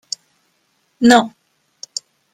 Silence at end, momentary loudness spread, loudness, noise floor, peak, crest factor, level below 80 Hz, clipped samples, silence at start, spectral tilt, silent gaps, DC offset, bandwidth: 1.05 s; 18 LU; -13 LUFS; -64 dBFS; 0 dBFS; 18 dB; -60 dBFS; under 0.1%; 1 s; -3 dB/octave; none; under 0.1%; 14.5 kHz